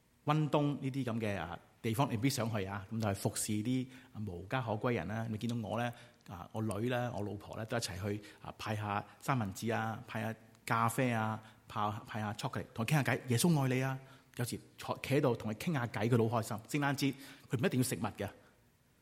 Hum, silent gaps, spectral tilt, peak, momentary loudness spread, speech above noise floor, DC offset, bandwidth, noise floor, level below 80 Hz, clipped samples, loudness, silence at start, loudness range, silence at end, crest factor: none; none; -5.5 dB/octave; -16 dBFS; 12 LU; 33 dB; under 0.1%; 16.5 kHz; -69 dBFS; -68 dBFS; under 0.1%; -36 LUFS; 0.25 s; 4 LU; 0.65 s; 22 dB